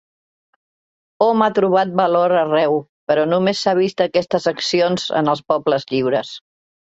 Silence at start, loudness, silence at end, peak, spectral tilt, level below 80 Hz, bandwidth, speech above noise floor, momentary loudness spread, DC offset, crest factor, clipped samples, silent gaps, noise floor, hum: 1.2 s; -17 LUFS; 0.45 s; -2 dBFS; -5.5 dB/octave; -62 dBFS; 8.2 kHz; over 73 dB; 5 LU; under 0.1%; 16 dB; under 0.1%; 2.89-3.07 s; under -90 dBFS; none